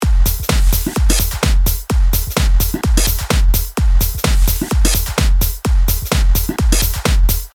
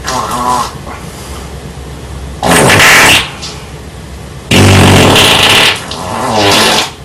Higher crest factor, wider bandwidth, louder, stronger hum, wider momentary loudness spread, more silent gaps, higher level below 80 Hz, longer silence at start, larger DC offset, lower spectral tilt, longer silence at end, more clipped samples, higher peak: about the same, 12 dB vs 8 dB; about the same, over 20 kHz vs over 20 kHz; second, -16 LUFS vs -6 LUFS; neither; second, 2 LU vs 22 LU; neither; first, -14 dBFS vs -28 dBFS; about the same, 0 s vs 0 s; neither; about the same, -4 dB/octave vs -3 dB/octave; about the same, 0.05 s vs 0 s; second, under 0.1% vs 1%; about the same, 0 dBFS vs 0 dBFS